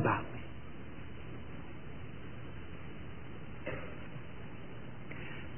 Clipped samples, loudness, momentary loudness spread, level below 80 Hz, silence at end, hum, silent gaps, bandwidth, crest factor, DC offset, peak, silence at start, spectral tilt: under 0.1%; -45 LUFS; 6 LU; -56 dBFS; 0 s; none; none; 3.2 kHz; 24 dB; 0.7%; -18 dBFS; 0 s; -3.5 dB/octave